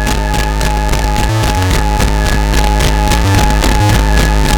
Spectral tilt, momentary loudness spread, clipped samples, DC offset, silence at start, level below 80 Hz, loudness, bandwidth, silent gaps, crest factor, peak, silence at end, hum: -4.5 dB/octave; 4 LU; under 0.1%; under 0.1%; 0 s; -12 dBFS; -12 LUFS; 19 kHz; none; 10 dB; 0 dBFS; 0 s; none